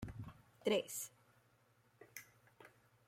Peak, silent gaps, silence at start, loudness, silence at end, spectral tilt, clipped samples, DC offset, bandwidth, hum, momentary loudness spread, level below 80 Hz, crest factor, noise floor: -24 dBFS; none; 0 s; -42 LUFS; 0.4 s; -3.5 dB/octave; under 0.1%; under 0.1%; 16.5 kHz; none; 25 LU; -70 dBFS; 22 dB; -74 dBFS